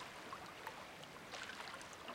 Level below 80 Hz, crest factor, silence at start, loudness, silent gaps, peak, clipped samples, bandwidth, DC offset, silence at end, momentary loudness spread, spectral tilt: -76 dBFS; 20 dB; 0 s; -50 LUFS; none; -32 dBFS; under 0.1%; 16.5 kHz; under 0.1%; 0 s; 4 LU; -2.5 dB/octave